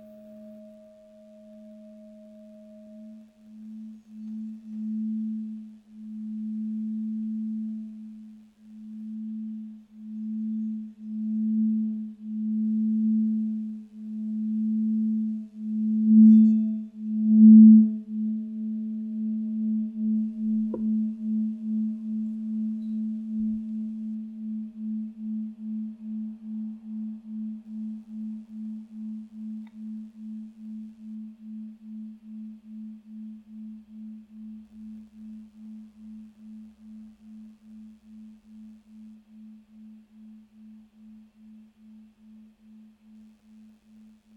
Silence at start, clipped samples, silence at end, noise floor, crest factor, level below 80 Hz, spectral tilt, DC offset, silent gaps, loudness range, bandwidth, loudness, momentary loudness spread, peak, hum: 0 s; under 0.1%; 1.15 s; -54 dBFS; 20 dB; -72 dBFS; -11.5 dB/octave; under 0.1%; none; 25 LU; 1 kHz; -25 LUFS; 21 LU; -6 dBFS; none